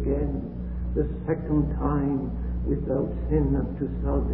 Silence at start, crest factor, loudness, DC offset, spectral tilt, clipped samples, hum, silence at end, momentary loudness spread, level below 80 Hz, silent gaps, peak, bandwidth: 0 s; 14 dB; -27 LUFS; 0.3%; -14 dB/octave; under 0.1%; none; 0 s; 6 LU; -30 dBFS; none; -10 dBFS; 3 kHz